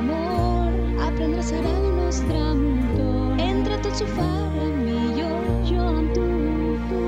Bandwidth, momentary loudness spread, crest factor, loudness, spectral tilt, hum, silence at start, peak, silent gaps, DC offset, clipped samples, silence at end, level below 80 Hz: 9.2 kHz; 2 LU; 12 dB; -23 LUFS; -7 dB/octave; none; 0 s; -10 dBFS; none; under 0.1%; under 0.1%; 0 s; -26 dBFS